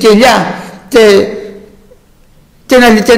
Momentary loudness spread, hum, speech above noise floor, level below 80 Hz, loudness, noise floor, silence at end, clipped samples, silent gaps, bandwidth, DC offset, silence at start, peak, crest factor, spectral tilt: 19 LU; none; 38 dB; -38 dBFS; -7 LUFS; -43 dBFS; 0 s; 0.5%; none; 16.5 kHz; under 0.1%; 0 s; 0 dBFS; 8 dB; -4.5 dB/octave